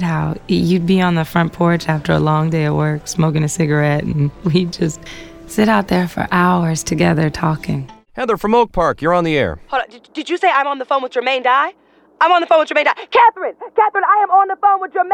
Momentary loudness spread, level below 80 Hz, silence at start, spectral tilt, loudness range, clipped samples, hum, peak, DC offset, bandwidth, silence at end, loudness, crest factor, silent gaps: 9 LU; -40 dBFS; 0 s; -6 dB/octave; 3 LU; under 0.1%; none; -2 dBFS; under 0.1%; 18 kHz; 0 s; -16 LUFS; 14 dB; none